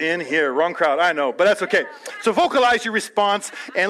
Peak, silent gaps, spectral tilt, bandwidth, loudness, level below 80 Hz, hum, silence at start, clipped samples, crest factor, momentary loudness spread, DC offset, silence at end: -6 dBFS; none; -3 dB/octave; 14 kHz; -19 LUFS; -62 dBFS; none; 0 s; under 0.1%; 14 dB; 7 LU; under 0.1%; 0 s